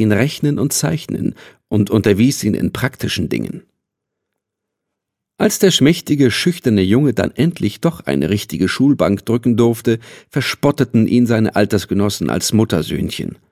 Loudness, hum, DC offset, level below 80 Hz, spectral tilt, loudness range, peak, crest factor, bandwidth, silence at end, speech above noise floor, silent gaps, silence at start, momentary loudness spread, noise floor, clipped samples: -16 LUFS; none; under 0.1%; -42 dBFS; -5.5 dB/octave; 4 LU; 0 dBFS; 16 dB; 16 kHz; 0.15 s; 64 dB; none; 0 s; 8 LU; -79 dBFS; under 0.1%